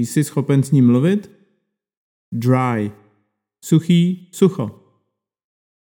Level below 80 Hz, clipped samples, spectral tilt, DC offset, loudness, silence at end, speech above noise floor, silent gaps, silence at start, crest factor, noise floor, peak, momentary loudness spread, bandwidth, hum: -68 dBFS; under 0.1%; -7 dB/octave; under 0.1%; -17 LUFS; 1.2 s; 56 dB; 1.97-2.32 s; 0 s; 18 dB; -72 dBFS; -2 dBFS; 14 LU; 18 kHz; none